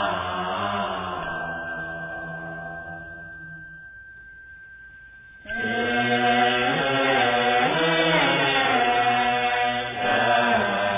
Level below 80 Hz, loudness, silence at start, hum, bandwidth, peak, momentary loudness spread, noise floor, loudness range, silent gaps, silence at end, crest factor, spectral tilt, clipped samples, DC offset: -54 dBFS; -22 LUFS; 0 s; none; 3.9 kHz; -8 dBFS; 22 LU; -46 dBFS; 16 LU; none; 0 s; 16 dB; -8 dB/octave; under 0.1%; under 0.1%